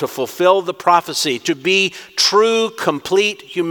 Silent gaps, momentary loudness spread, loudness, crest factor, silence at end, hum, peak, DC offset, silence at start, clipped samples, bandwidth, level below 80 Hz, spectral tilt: none; 6 LU; -16 LUFS; 16 dB; 0 s; none; 0 dBFS; under 0.1%; 0 s; under 0.1%; 19 kHz; -66 dBFS; -2.5 dB/octave